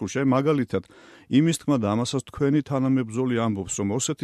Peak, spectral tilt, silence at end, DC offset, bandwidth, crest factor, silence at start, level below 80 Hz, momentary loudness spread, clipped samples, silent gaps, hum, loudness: -8 dBFS; -5.5 dB/octave; 0 s; under 0.1%; 13 kHz; 16 dB; 0 s; -56 dBFS; 5 LU; under 0.1%; none; none; -24 LUFS